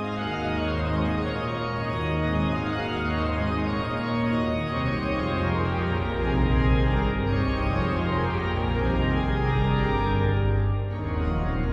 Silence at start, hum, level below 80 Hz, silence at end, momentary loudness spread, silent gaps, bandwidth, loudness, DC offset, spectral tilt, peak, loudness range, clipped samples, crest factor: 0 s; none; -32 dBFS; 0 s; 4 LU; none; 7.4 kHz; -26 LUFS; under 0.1%; -8.5 dB/octave; -10 dBFS; 2 LU; under 0.1%; 14 dB